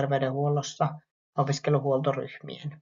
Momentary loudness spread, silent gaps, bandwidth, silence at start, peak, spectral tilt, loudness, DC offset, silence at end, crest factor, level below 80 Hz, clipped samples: 13 LU; 1.11-1.33 s; 7.4 kHz; 0 s; -10 dBFS; -6 dB/octave; -28 LUFS; under 0.1%; 0.05 s; 18 dB; -70 dBFS; under 0.1%